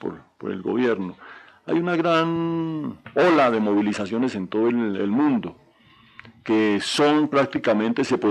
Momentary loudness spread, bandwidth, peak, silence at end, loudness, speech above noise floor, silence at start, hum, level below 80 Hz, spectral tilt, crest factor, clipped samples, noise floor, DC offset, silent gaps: 14 LU; 11 kHz; -8 dBFS; 0 s; -22 LUFS; 33 dB; 0 s; none; -66 dBFS; -6 dB/octave; 14 dB; under 0.1%; -54 dBFS; under 0.1%; none